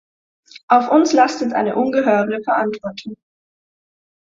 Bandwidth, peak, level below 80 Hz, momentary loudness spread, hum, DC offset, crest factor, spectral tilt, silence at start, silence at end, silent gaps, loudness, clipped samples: 7.6 kHz; -2 dBFS; -64 dBFS; 15 LU; none; under 0.1%; 18 dB; -5 dB/octave; 0.7 s; 1.2 s; none; -16 LUFS; under 0.1%